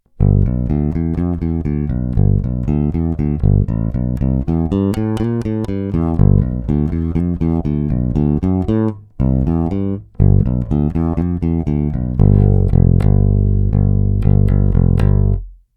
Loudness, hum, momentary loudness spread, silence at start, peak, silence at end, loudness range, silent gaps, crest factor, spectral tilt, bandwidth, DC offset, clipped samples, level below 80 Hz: -16 LUFS; none; 6 LU; 0.2 s; 0 dBFS; 0.25 s; 3 LU; none; 14 dB; -11 dB/octave; 3.9 kHz; under 0.1%; under 0.1%; -20 dBFS